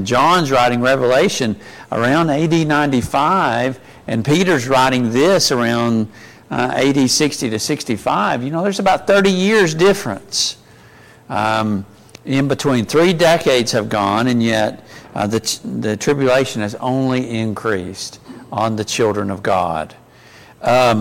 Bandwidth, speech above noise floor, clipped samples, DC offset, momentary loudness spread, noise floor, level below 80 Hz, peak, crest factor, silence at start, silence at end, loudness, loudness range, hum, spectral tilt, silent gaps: 17 kHz; 28 dB; under 0.1%; under 0.1%; 10 LU; -44 dBFS; -48 dBFS; -6 dBFS; 12 dB; 0 s; 0 s; -16 LUFS; 4 LU; none; -4.5 dB/octave; none